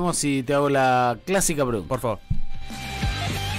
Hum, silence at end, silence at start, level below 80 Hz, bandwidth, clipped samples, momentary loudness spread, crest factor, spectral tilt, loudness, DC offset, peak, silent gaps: none; 0 s; 0 s; -34 dBFS; 16 kHz; under 0.1%; 13 LU; 12 dB; -4.5 dB/octave; -23 LUFS; under 0.1%; -10 dBFS; none